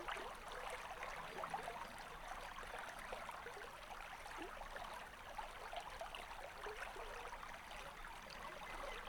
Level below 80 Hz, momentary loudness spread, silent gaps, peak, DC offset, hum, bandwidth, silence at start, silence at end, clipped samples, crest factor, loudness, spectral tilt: -60 dBFS; 4 LU; none; -32 dBFS; under 0.1%; none; 19 kHz; 0 s; 0 s; under 0.1%; 18 dB; -50 LUFS; -2.5 dB/octave